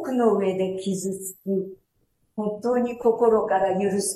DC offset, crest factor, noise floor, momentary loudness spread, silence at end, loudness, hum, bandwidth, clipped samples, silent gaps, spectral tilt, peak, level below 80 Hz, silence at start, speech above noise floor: under 0.1%; 16 dB; -69 dBFS; 10 LU; 0 s; -24 LUFS; none; 14 kHz; under 0.1%; none; -5.5 dB/octave; -8 dBFS; -62 dBFS; 0 s; 46 dB